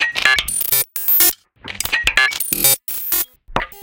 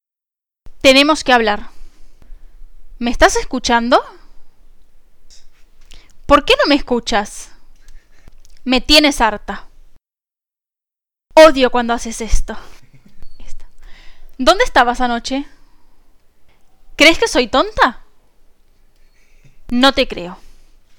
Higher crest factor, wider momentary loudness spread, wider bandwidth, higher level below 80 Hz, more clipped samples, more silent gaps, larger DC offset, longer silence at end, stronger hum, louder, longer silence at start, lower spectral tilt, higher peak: about the same, 18 dB vs 16 dB; second, 13 LU vs 19 LU; about the same, 19 kHz vs 18.5 kHz; second, -40 dBFS vs -30 dBFS; neither; neither; neither; second, 0 s vs 0.5 s; neither; about the same, -15 LUFS vs -13 LUFS; second, 0 s vs 0.65 s; second, 0 dB/octave vs -3 dB/octave; about the same, 0 dBFS vs 0 dBFS